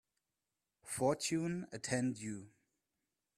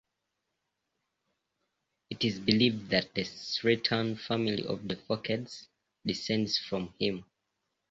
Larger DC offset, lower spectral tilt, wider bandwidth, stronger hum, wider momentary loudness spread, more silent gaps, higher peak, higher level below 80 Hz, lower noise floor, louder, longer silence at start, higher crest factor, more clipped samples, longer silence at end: neither; about the same, -4.5 dB/octave vs -5.5 dB/octave; first, 15.5 kHz vs 7.8 kHz; neither; about the same, 11 LU vs 10 LU; neither; second, -20 dBFS vs -8 dBFS; second, -76 dBFS vs -64 dBFS; first, under -90 dBFS vs -84 dBFS; second, -38 LUFS vs -31 LUFS; second, 0.85 s vs 2.1 s; about the same, 20 dB vs 24 dB; neither; first, 0.9 s vs 0.65 s